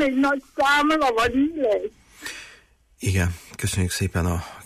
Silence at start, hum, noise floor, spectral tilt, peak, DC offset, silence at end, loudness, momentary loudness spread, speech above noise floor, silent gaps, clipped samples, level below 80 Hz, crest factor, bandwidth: 0 s; none; -54 dBFS; -5 dB/octave; -10 dBFS; under 0.1%; 0 s; -22 LUFS; 16 LU; 32 dB; none; under 0.1%; -42 dBFS; 12 dB; 15.5 kHz